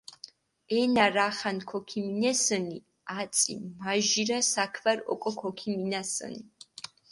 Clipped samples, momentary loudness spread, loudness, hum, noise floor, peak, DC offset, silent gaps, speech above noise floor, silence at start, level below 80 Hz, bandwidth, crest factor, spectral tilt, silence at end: under 0.1%; 19 LU; -28 LUFS; none; -52 dBFS; -8 dBFS; under 0.1%; none; 23 dB; 0.25 s; -72 dBFS; 11.5 kHz; 22 dB; -2.5 dB/octave; 0.65 s